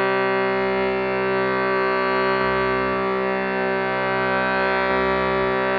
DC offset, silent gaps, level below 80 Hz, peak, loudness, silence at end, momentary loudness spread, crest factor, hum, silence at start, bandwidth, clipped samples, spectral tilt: under 0.1%; none; -46 dBFS; -8 dBFS; -21 LUFS; 0 s; 2 LU; 12 dB; none; 0 s; 5.6 kHz; under 0.1%; -3 dB/octave